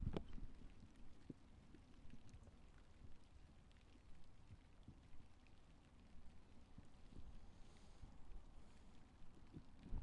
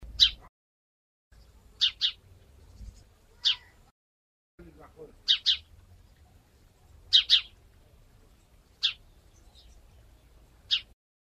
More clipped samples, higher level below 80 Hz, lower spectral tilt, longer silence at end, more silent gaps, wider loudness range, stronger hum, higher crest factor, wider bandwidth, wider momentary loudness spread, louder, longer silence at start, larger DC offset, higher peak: neither; about the same, -60 dBFS vs -56 dBFS; first, -7 dB/octave vs 0.5 dB/octave; second, 0 s vs 0.4 s; second, none vs 0.49-1.31 s, 3.91-4.58 s; second, 3 LU vs 8 LU; neither; about the same, 24 dB vs 26 dB; second, 10.5 kHz vs 14.5 kHz; second, 7 LU vs 12 LU; second, -64 LUFS vs -25 LUFS; about the same, 0 s vs 0 s; neither; second, -30 dBFS vs -6 dBFS